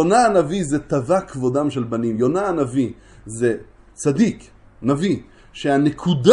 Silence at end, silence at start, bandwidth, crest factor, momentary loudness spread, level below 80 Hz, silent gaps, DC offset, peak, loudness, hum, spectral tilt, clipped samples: 0 s; 0 s; 11.5 kHz; 18 dB; 9 LU; -48 dBFS; none; under 0.1%; 0 dBFS; -20 LUFS; none; -6 dB/octave; under 0.1%